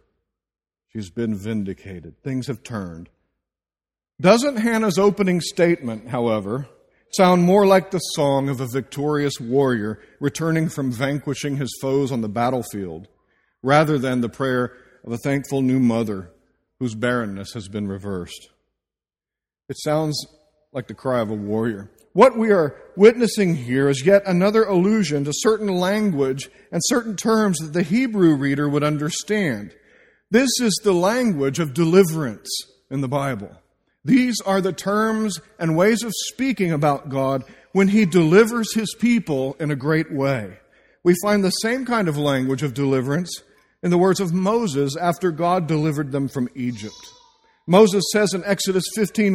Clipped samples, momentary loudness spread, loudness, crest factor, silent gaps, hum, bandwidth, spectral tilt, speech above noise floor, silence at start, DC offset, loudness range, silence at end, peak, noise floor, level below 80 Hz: under 0.1%; 14 LU; -20 LUFS; 20 dB; none; none; 16 kHz; -5.5 dB/octave; over 70 dB; 0.95 s; under 0.1%; 8 LU; 0 s; 0 dBFS; under -90 dBFS; -56 dBFS